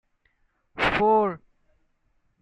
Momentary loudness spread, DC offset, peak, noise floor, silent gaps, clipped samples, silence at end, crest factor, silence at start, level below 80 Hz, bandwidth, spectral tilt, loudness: 22 LU; under 0.1%; -10 dBFS; -69 dBFS; none; under 0.1%; 1.05 s; 18 dB; 0.75 s; -52 dBFS; 9.4 kHz; -6 dB/octave; -23 LUFS